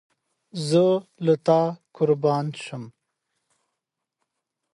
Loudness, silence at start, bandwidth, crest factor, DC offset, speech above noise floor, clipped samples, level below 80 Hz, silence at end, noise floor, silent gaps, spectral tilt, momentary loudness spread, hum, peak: -23 LUFS; 0.55 s; 11.5 kHz; 18 dB; under 0.1%; 61 dB; under 0.1%; -72 dBFS; 1.85 s; -83 dBFS; none; -7 dB/octave; 16 LU; none; -6 dBFS